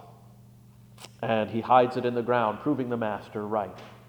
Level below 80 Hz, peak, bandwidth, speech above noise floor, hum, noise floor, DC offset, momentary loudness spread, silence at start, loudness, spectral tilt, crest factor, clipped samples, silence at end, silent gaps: -66 dBFS; -6 dBFS; over 20 kHz; 26 dB; none; -52 dBFS; under 0.1%; 14 LU; 0 s; -27 LUFS; -7 dB/octave; 22 dB; under 0.1%; 0.1 s; none